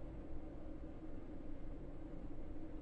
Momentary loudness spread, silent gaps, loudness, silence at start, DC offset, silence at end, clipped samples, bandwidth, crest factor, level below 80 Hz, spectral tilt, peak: 1 LU; none; -53 LUFS; 0 s; under 0.1%; 0 s; under 0.1%; 3.8 kHz; 12 dB; -50 dBFS; -9 dB/octave; -34 dBFS